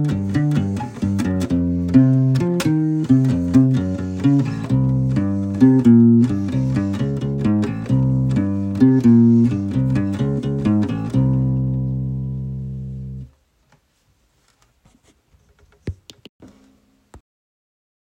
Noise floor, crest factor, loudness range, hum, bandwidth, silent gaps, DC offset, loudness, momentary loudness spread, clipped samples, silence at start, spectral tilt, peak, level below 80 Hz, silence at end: -62 dBFS; 18 dB; 10 LU; none; 15 kHz; 16.29-16.39 s; under 0.1%; -18 LUFS; 14 LU; under 0.1%; 0 s; -9 dB/octave; 0 dBFS; -40 dBFS; 1 s